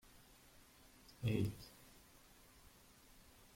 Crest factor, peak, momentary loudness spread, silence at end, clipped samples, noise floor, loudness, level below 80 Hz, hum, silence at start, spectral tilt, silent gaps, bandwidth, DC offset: 22 dB; -26 dBFS; 24 LU; 0.35 s; under 0.1%; -65 dBFS; -42 LUFS; -68 dBFS; none; 1.2 s; -6.5 dB/octave; none; 16.5 kHz; under 0.1%